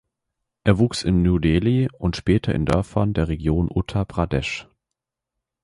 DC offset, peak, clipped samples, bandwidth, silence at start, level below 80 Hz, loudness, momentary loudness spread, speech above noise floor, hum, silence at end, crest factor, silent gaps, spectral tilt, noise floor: under 0.1%; -2 dBFS; under 0.1%; 11.5 kHz; 0.65 s; -34 dBFS; -21 LUFS; 6 LU; 64 dB; none; 1 s; 18 dB; none; -7 dB/octave; -84 dBFS